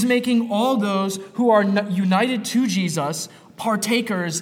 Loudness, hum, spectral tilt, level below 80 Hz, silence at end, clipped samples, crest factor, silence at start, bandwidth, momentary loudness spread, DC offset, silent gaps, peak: -21 LUFS; none; -5 dB/octave; -72 dBFS; 0 s; under 0.1%; 14 dB; 0 s; 16.5 kHz; 8 LU; under 0.1%; none; -6 dBFS